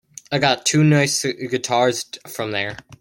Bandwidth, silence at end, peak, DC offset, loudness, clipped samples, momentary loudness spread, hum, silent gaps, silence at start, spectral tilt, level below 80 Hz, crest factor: 16.5 kHz; 0.05 s; -2 dBFS; under 0.1%; -19 LUFS; under 0.1%; 13 LU; none; none; 0.3 s; -4 dB/octave; -58 dBFS; 18 dB